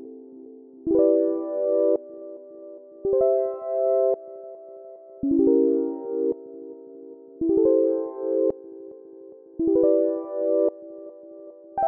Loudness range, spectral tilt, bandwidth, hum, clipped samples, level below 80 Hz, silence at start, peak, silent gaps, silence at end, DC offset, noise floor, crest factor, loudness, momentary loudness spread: 2 LU; -12 dB/octave; 2.1 kHz; none; under 0.1%; -60 dBFS; 0 s; -8 dBFS; none; 0 s; under 0.1%; -45 dBFS; 16 dB; -23 LUFS; 24 LU